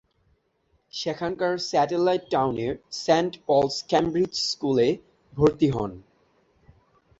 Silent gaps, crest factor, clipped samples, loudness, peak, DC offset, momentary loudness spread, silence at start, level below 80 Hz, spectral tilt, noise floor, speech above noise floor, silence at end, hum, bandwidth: none; 20 dB; under 0.1%; -24 LUFS; -6 dBFS; under 0.1%; 8 LU; 0.95 s; -54 dBFS; -5.5 dB/octave; -69 dBFS; 45 dB; 1.2 s; none; 8 kHz